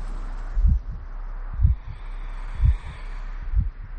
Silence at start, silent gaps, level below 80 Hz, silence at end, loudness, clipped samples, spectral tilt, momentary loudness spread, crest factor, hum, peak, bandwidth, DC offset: 0 s; none; -26 dBFS; 0 s; -28 LUFS; under 0.1%; -8.5 dB/octave; 14 LU; 18 dB; none; -6 dBFS; 4.9 kHz; under 0.1%